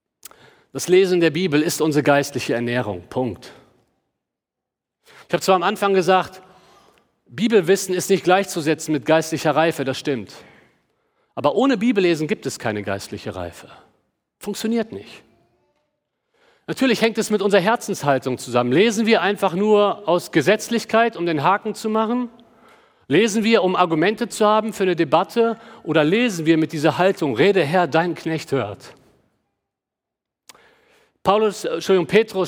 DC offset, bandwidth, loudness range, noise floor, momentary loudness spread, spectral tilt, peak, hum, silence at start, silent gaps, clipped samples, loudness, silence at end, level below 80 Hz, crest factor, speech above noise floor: under 0.1%; over 20 kHz; 8 LU; -85 dBFS; 11 LU; -5 dB/octave; -2 dBFS; none; 0.75 s; none; under 0.1%; -19 LUFS; 0 s; -66 dBFS; 18 dB; 66 dB